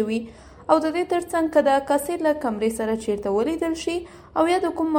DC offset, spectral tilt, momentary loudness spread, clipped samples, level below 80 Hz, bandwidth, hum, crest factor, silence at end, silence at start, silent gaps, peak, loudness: under 0.1%; -4.5 dB/octave; 9 LU; under 0.1%; -52 dBFS; 17 kHz; none; 20 dB; 0 s; 0 s; none; -2 dBFS; -23 LUFS